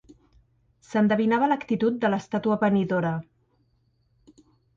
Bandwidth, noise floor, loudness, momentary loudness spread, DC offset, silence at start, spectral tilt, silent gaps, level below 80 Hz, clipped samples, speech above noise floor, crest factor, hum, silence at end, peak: 7.4 kHz; -67 dBFS; -24 LUFS; 6 LU; under 0.1%; 0.9 s; -7.5 dB/octave; none; -64 dBFS; under 0.1%; 44 dB; 16 dB; none; 1.55 s; -10 dBFS